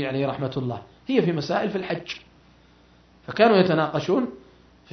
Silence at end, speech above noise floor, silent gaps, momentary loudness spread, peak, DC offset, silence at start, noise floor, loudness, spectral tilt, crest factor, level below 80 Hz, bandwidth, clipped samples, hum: 0.55 s; 32 dB; none; 17 LU; -6 dBFS; under 0.1%; 0 s; -55 dBFS; -23 LUFS; -7 dB/octave; 18 dB; -60 dBFS; 6.4 kHz; under 0.1%; 60 Hz at -55 dBFS